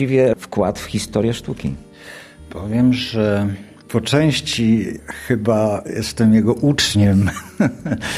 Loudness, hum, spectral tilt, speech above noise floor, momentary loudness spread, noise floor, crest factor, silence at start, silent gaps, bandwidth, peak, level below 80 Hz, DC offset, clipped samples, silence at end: -18 LUFS; none; -5.5 dB/octave; 22 dB; 16 LU; -39 dBFS; 16 dB; 0 s; none; 14.5 kHz; -2 dBFS; -42 dBFS; under 0.1%; under 0.1%; 0 s